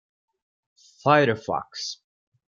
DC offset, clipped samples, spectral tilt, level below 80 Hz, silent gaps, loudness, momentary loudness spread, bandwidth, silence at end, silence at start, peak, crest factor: under 0.1%; under 0.1%; -5 dB/octave; -68 dBFS; none; -24 LUFS; 14 LU; 7.6 kHz; 0.6 s; 1.05 s; -4 dBFS; 22 dB